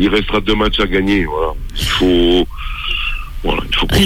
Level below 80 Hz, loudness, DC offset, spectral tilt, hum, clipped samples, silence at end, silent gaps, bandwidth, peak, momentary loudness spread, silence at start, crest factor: -22 dBFS; -16 LUFS; under 0.1%; -5 dB/octave; none; under 0.1%; 0 s; none; 16 kHz; -2 dBFS; 9 LU; 0 s; 12 dB